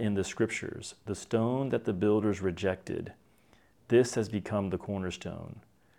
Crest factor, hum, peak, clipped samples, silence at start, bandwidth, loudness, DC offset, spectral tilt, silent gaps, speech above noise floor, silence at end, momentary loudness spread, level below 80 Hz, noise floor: 18 dB; none; -12 dBFS; under 0.1%; 0 s; 13.5 kHz; -31 LUFS; under 0.1%; -6 dB/octave; none; 33 dB; 0.4 s; 14 LU; -64 dBFS; -64 dBFS